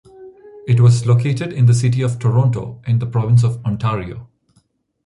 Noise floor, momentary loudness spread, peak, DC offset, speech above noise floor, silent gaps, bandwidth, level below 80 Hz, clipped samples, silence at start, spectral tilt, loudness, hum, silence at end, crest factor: -60 dBFS; 12 LU; -2 dBFS; under 0.1%; 45 dB; none; 11 kHz; -46 dBFS; under 0.1%; 0.2 s; -7.5 dB/octave; -16 LUFS; none; 0.8 s; 14 dB